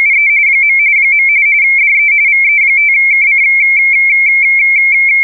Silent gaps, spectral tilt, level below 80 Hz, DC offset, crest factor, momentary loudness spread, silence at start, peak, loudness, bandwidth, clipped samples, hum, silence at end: none; 0 dB/octave; under -90 dBFS; 0.9%; 4 dB; 0 LU; 0 s; -4 dBFS; -6 LUFS; 2.8 kHz; under 0.1%; none; 0 s